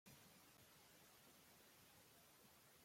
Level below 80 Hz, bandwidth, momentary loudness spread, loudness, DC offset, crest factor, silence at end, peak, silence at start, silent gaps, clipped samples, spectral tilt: under -90 dBFS; 16.5 kHz; 2 LU; -68 LUFS; under 0.1%; 16 dB; 0 s; -52 dBFS; 0.05 s; none; under 0.1%; -2.5 dB/octave